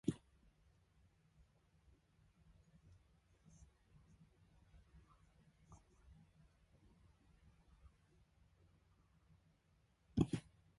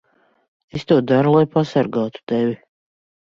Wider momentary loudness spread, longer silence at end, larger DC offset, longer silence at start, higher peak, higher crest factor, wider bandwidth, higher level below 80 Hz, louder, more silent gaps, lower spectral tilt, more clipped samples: first, 28 LU vs 15 LU; second, 0.4 s vs 0.8 s; neither; second, 0.05 s vs 0.75 s; second, -20 dBFS vs -2 dBFS; first, 32 dB vs 16 dB; first, 11 kHz vs 7.4 kHz; second, -68 dBFS vs -58 dBFS; second, -43 LUFS vs -18 LUFS; second, none vs 2.23-2.27 s; about the same, -7.5 dB/octave vs -8 dB/octave; neither